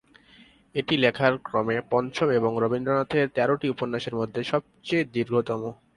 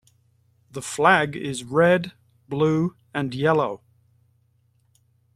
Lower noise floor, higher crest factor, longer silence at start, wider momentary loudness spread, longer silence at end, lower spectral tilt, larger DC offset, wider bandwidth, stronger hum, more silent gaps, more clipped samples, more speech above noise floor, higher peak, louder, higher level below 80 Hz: second, -55 dBFS vs -64 dBFS; about the same, 20 dB vs 22 dB; about the same, 0.75 s vs 0.75 s; second, 7 LU vs 16 LU; second, 0.2 s vs 1.6 s; about the same, -6.5 dB/octave vs -5.5 dB/octave; neither; second, 11 kHz vs 14 kHz; neither; neither; neither; second, 30 dB vs 43 dB; second, -6 dBFS vs -2 dBFS; second, -25 LUFS vs -22 LUFS; about the same, -62 dBFS vs -62 dBFS